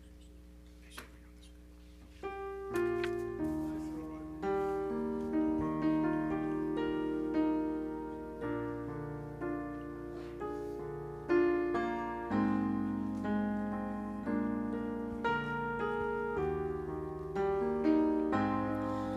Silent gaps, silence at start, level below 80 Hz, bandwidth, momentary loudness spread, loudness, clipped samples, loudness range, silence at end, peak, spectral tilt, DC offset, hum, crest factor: none; 0 s; -54 dBFS; 12.5 kHz; 11 LU; -35 LUFS; under 0.1%; 6 LU; 0 s; -18 dBFS; -8 dB/octave; under 0.1%; none; 18 dB